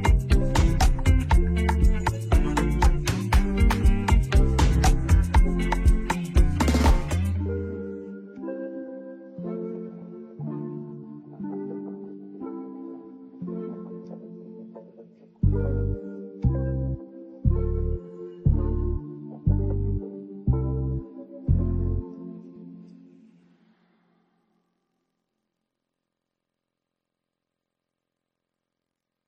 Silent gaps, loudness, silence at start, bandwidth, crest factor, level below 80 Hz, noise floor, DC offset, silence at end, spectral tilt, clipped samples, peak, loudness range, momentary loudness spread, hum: none; -25 LUFS; 0 s; 14.5 kHz; 16 dB; -26 dBFS; -85 dBFS; under 0.1%; 6.4 s; -6.5 dB/octave; under 0.1%; -8 dBFS; 14 LU; 19 LU; none